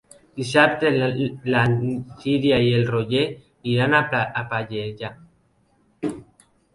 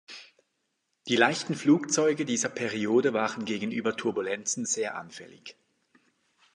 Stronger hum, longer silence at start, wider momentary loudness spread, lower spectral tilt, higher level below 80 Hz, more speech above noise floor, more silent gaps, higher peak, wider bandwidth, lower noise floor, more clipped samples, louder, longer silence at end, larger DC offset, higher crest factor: neither; first, 0.35 s vs 0.1 s; second, 14 LU vs 21 LU; first, -6.5 dB/octave vs -3.5 dB/octave; first, -54 dBFS vs -76 dBFS; second, 41 dB vs 51 dB; neither; first, 0 dBFS vs -8 dBFS; about the same, 11.5 kHz vs 11.5 kHz; second, -62 dBFS vs -78 dBFS; neither; first, -21 LUFS vs -27 LUFS; second, 0.5 s vs 1.05 s; neither; about the same, 22 dB vs 22 dB